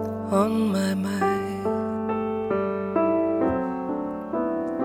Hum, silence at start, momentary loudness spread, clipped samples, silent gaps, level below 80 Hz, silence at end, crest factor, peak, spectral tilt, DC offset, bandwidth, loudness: none; 0 s; 6 LU; under 0.1%; none; -56 dBFS; 0 s; 16 dB; -10 dBFS; -7 dB/octave; under 0.1%; 15.5 kHz; -25 LUFS